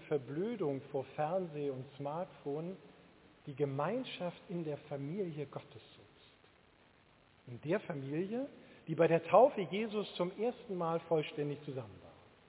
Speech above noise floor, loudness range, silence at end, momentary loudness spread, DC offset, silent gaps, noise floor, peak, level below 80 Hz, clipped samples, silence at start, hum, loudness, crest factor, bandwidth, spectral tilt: 30 dB; 11 LU; 0.35 s; 16 LU; under 0.1%; none; -66 dBFS; -14 dBFS; -76 dBFS; under 0.1%; 0 s; none; -37 LUFS; 24 dB; 4 kHz; -5.5 dB/octave